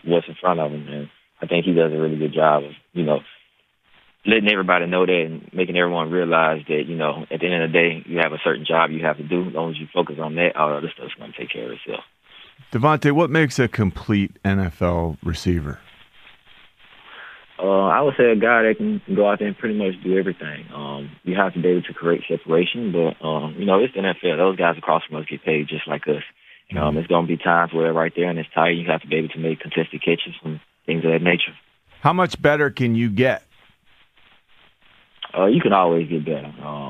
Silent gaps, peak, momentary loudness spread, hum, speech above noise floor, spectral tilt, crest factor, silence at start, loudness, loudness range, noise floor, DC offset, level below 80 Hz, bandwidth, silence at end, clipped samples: none; -2 dBFS; 14 LU; none; 41 dB; -7 dB/octave; 18 dB; 0.05 s; -20 LUFS; 4 LU; -61 dBFS; under 0.1%; -48 dBFS; 12 kHz; 0 s; under 0.1%